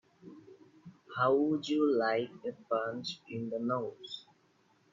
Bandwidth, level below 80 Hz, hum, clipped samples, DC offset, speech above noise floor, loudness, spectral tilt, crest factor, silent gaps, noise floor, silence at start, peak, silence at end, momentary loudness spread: 7.6 kHz; -80 dBFS; none; under 0.1%; under 0.1%; 37 dB; -33 LUFS; -6 dB/octave; 18 dB; none; -69 dBFS; 0.25 s; -16 dBFS; 0.7 s; 17 LU